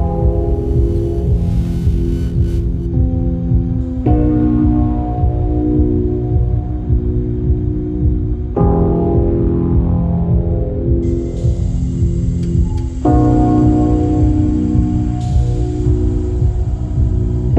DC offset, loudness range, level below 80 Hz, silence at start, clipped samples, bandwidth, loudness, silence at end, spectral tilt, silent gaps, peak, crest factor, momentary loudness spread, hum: under 0.1%; 3 LU; -18 dBFS; 0 s; under 0.1%; 8 kHz; -16 LUFS; 0 s; -10.5 dB/octave; none; -2 dBFS; 12 dB; 5 LU; none